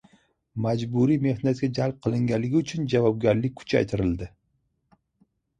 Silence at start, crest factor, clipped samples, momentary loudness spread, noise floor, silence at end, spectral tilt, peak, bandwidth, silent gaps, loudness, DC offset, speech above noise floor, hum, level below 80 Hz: 0.55 s; 18 dB; under 0.1%; 6 LU; -72 dBFS; 1.3 s; -7.5 dB/octave; -8 dBFS; 9.4 kHz; none; -25 LUFS; under 0.1%; 49 dB; none; -50 dBFS